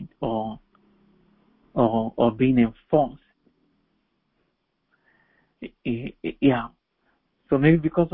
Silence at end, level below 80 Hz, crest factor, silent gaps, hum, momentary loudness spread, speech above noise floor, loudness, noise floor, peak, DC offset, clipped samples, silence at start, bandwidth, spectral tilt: 0.05 s; -50 dBFS; 20 dB; none; none; 16 LU; 52 dB; -23 LUFS; -73 dBFS; -4 dBFS; under 0.1%; under 0.1%; 0 s; 4 kHz; -12 dB/octave